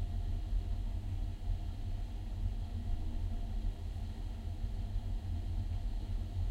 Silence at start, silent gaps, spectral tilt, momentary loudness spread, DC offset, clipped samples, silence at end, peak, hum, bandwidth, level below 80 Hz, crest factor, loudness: 0 s; none; -7.5 dB/octave; 4 LU; under 0.1%; under 0.1%; 0 s; -24 dBFS; none; 8.4 kHz; -38 dBFS; 12 dB; -42 LUFS